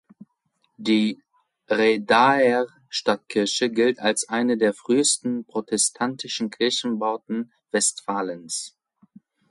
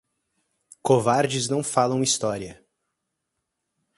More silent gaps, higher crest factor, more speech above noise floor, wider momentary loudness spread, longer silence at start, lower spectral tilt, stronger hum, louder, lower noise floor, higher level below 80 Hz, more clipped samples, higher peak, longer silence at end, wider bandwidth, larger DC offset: neither; about the same, 18 dB vs 22 dB; second, 48 dB vs 58 dB; about the same, 11 LU vs 12 LU; about the same, 0.8 s vs 0.85 s; second, -2.5 dB/octave vs -4 dB/octave; neither; about the same, -22 LUFS vs -23 LUFS; second, -71 dBFS vs -80 dBFS; second, -70 dBFS vs -62 dBFS; neither; about the same, -6 dBFS vs -4 dBFS; second, 0.8 s vs 1.45 s; about the same, 11.5 kHz vs 11.5 kHz; neither